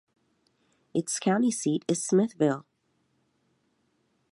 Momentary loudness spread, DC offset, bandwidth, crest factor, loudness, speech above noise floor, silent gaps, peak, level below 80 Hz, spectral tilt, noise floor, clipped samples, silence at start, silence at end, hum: 8 LU; under 0.1%; 11.5 kHz; 18 dB; -27 LUFS; 47 dB; none; -12 dBFS; -76 dBFS; -5 dB/octave; -73 dBFS; under 0.1%; 0.95 s; 1.7 s; none